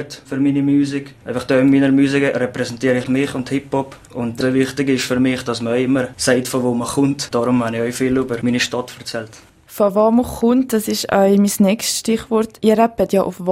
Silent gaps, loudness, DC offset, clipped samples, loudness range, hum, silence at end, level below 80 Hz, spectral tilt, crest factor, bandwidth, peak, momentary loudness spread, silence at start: none; -17 LUFS; under 0.1%; under 0.1%; 3 LU; none; 0 s; -48 dBFS; -5 dB/octave; 16 dB; 16 kHz; 0 dBFS; 11 LU; 0 s